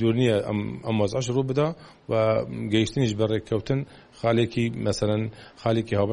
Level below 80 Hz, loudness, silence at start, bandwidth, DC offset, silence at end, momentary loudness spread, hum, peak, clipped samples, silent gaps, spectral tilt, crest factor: -50 dBFS; -25 LUFS; 0 s; 11 kHz; under 0.1%; 0 s; 6 LU; none; -8 dBFS; under 0.1%; none; -6.5 dB/octave; 16 dB